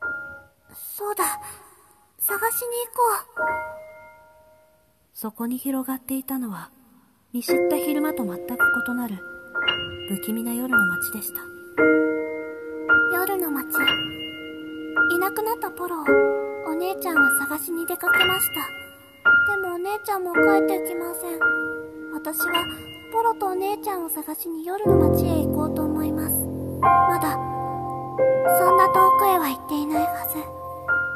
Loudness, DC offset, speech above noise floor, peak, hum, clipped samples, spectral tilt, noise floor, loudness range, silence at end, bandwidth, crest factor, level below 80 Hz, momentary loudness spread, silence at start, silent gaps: -22 LUFS; under 0.1%; 38 dB; -4 dBFS; none; under 0.1%; -4 dB/octave; -61 dBFS; 7 LU; 0 s; 14.5 kHz; 18 dB; -52 dBFS; 14 LU; 0 s; none